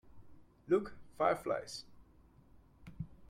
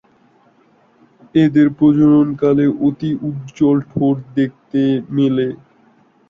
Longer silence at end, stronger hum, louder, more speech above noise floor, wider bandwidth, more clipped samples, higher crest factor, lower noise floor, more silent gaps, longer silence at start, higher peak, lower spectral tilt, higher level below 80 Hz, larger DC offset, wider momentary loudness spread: second, 0.05 s vs 0.75 s; neither; second, -36 LUFS vs -16 LUFS; second, 29 dB vs 39 dB; first, 15.5 kHz vs 6.8 kHz; neither; first, 24 dB vs 14 dB; first, -63 dBFS vs -54 dBFS; neither; second, 0.05 s vs 1.35 s; second, -16 dBFS vs -2 dBFS; second, -5.5 dB/octave vs -9 dB/octave; second, -64 dBFS vs -54 dBFS; neither; first, 16 LU vs 9 LU